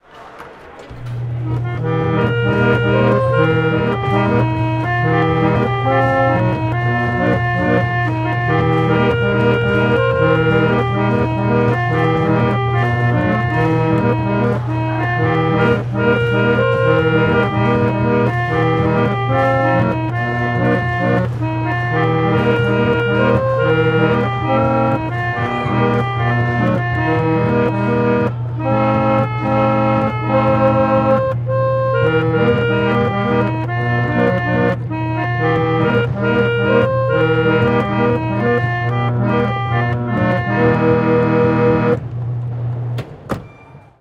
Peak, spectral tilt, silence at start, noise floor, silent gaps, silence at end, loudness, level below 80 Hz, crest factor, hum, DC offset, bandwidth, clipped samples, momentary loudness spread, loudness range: -2 dBFS; -8.5 dB/octave; 0.15 s; -41 dBFS; none; 0.2 s; -16 LUFS; -40 dBFS; 14 dB; none; under 0.1%; 5.8 kHz; under 0.1%; 5 LU; 2 LU